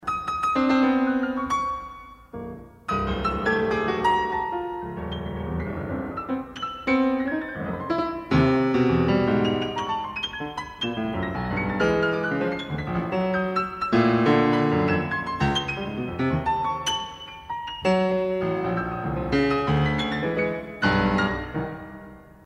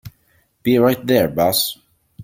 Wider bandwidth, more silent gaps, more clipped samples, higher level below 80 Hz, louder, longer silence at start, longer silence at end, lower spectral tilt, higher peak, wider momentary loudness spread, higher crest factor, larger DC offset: second, 11.5 kHz vs 17 kHz; neither; neither; first, -44 dBFS vs -52 dBFS; second, -25 LUFS vs -17 LUFS; about the same, 0 s vs 0.05 s; first, 0.15 s vs 0 s; first, -6.5 dB/octave vs -4.5 dB/octave; second, -8 dBFS vs -2 dBFS; about the same, 11 LU vs 9 LU; about the same, 16 dB vs 18 dB; neither